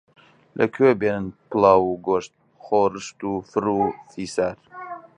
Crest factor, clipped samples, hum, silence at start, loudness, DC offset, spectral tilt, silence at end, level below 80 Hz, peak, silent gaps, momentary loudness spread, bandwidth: 20 dB; under 0.1%; none; 0.55 s; -22 LUFS; under 0.1%; -6 dB/octave; 0.15 s; -56 dBFS; -2 dBFS; none; 18 LU; 10.5 kHz